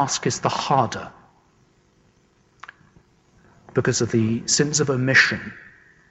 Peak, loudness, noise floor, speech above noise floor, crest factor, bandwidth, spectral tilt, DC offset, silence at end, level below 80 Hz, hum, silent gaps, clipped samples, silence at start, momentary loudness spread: -6 dBFS; -20 LUFS; -60 dBFS; 39 dB; 18 dB; 8.4 kHz; -3.5 dB/octave; under 0.1%; 0.45 s; -58 dBFS; none; none; under 0.1%; 0 s; 14 LU